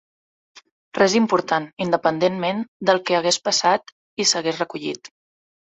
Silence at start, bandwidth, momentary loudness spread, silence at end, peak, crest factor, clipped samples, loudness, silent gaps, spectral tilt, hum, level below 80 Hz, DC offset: 0.95 s; 8.4 kHz; 10 LU; 0.6 s; -2 dBFS; 20 dB; under 0.1%; -20 LUFS; 1.73-1.77 s, 2.68-2.80 s, 3.92-4.17 s; -3 dB/octave; none; -64 dBFS; under 0.1%